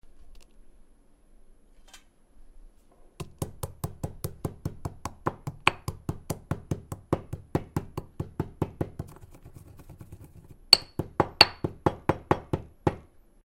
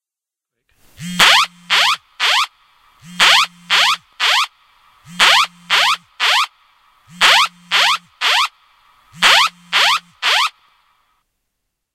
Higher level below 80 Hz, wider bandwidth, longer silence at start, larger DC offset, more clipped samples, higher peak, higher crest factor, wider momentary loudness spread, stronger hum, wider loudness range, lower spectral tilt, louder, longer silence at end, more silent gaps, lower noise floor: first, -50 dBFS vs -56 dBFS; about the same, 16.5 kHz vs 17 kHz; second, 0.05 s vs 1 s; neither; neither; about the same, 0 dBFS vs 0 dBFS; first, 32 dB vs 18 dB; first, 23 LU vs 7 LU; neither; first, 16 LU vs 2 LU; first, -4 dB/octave vs 0.5 dB/octave; second, -28 LUFS vs -13 LUFS; second, 0.5 s vs 1.45 s; neither; second, -57 dBFS vs -87 dBFS